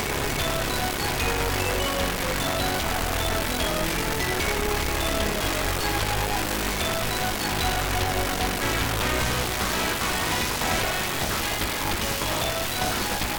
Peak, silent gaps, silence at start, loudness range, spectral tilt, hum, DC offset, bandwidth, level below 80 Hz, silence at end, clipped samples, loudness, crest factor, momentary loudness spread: -12 dBFS; none; 0 s; 1 LU; -3 dB/octave; none; under 0.1%; 19.5 kHz; -34 dBFS; 0 s; under 0.1%; -25 LUFS; 12 dB; 1 LU